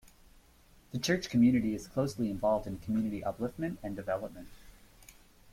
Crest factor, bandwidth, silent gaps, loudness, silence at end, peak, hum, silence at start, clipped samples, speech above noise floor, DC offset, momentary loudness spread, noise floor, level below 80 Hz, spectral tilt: 18 dB; 16 kHz; none; -32 LUFS; 0.4 s; -16 dBFS; none; 0.05 s; under 0.1%; 29 dB; under 0.1%; 12 LU; -61 dBFS; -56 dBFS; -6 dB/octave